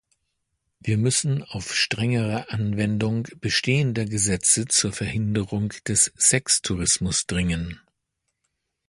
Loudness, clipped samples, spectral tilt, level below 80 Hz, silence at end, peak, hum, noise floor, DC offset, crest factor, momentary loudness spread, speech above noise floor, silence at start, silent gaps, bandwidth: -22 LUFS; under 0.1%; -3.5 dB/octave; -46 dBFS; 1.1 s; -4 dBFS; none; -78 dBFS; under 0.1%; 20 dB; 9 LU; 55 dB; 0.85 s; none; 11.5 kHz